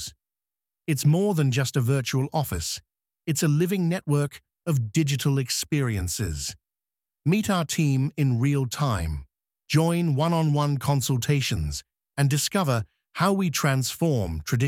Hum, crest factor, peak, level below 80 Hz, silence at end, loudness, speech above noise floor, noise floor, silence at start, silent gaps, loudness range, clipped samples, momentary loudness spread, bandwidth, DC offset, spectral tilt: none; 16 dB; -8 dBFS; -44 dBFS; 0 s; -25 LUFS; over 66 dB; under -90 dBFS; 0 s; none; 2 LU; under 0.1%; 9 LU; 16.5 kHz; under 0.1%; -5.5 dB/octave